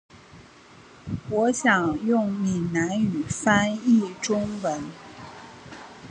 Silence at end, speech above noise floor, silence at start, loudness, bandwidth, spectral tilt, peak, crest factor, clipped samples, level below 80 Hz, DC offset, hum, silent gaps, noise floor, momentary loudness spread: 0 s; 26 dB; 0.35 s; -24 LUFS; 10 kHz; -5 dB/octave; -4 dBFS; 20 dB; under 0.1%; -54 dBFS; under 0.1%; none; none; -50 dBFS; 21 LU